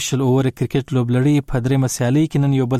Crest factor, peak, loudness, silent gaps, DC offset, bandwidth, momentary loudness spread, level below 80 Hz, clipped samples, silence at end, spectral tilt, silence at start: 10 dB; -8 dBFS; -18 LUFS; none; under 0.1%; 14.5 kHz; 3 LU; -40 dBFS; under 0.1%; 0 s; -6.5 dB/octave; 0 s